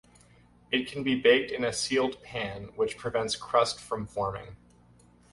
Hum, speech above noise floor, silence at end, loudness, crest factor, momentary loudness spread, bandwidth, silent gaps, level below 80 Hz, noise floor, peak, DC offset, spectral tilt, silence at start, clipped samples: 60 Hz at -55 dBFS; 30 dB; 0.75 s; -28 LUFS; 22 dB; 12 LU; 11.5 kHz; none; -58 dBFS; -59 dBFS; -8 dBFS; under 0.1%; -3.5 dB/octave; 0.7 s; under 0.1%